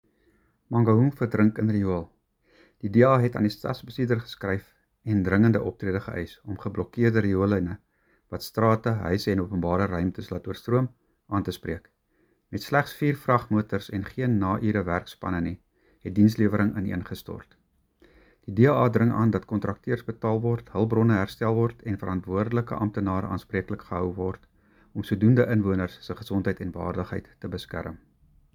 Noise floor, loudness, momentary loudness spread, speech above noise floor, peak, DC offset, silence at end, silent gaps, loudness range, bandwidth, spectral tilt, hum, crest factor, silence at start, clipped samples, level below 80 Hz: -68 dBFS; -26 LUFS; 14 LU; 43 dB; -4 dBFS; under 0.1%; 0.6 s; none; 4 LU; 19.5 kHz; -8.5 dB/octave; none; 20 dB; 0.7 s; under 0.1%; -52 dBFS